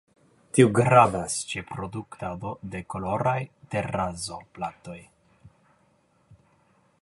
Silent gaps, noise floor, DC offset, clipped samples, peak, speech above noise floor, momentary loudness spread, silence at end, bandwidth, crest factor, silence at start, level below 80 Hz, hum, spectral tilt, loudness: none; -65 dBFS; under 0.1%; under 0.1%; -4 dBFS; 40 dB; 18 LU; 1.55 s; 11.5 kHz; 24 dB; 0.55 s; -54 dBFS; none; -5.5 dB/octave; -26 LUFS